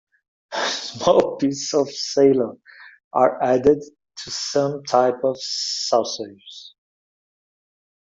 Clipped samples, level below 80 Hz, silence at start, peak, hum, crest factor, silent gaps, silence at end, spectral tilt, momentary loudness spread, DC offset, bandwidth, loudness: under 0.1%; -58 dBFS; 0.5 s; -2 dBFS; none; 20 dB; 3.04-3.11 s; 1.35 s; -4 dB/octave; 14 LU; under 0.1%; 7.8 kHz; -21 LUFS